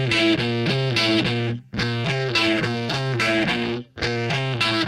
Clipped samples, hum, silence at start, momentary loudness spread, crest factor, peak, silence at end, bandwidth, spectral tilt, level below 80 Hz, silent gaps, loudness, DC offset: under 0.1%; none; 0 s; 7 LU; 14 dB; -8 dBFS; 0 s; 13.5 kHz; -5 dB/octave; -50 dBFS; none; -21 LUFS; under 0.1%